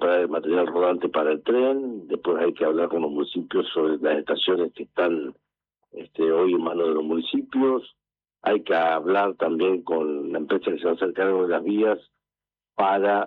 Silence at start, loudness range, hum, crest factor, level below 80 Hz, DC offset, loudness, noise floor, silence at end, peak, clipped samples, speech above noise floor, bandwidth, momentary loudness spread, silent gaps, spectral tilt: 0 s; 2 LU; none; 14 dB; -74 dBFS; under 0.1%; -24 LUFS; under -90 dBFS; 0 s; -10 dBFS; under 0.1%; over 67 dB; 4.5 kHz; 7 LU; none; -8 dB/octave